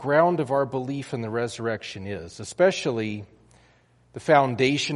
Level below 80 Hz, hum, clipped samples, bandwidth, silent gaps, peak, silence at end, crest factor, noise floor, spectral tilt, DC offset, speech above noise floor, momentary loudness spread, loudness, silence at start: -62 dBFS; none; under 0.1%; 11.5 kHz; none; -4 dBFS; 0 s; 20 dB; -59 dBFS; -5.5 dB/octave; under 0.1%; 35 dB; 15 LU; -25 LUFS; 0 s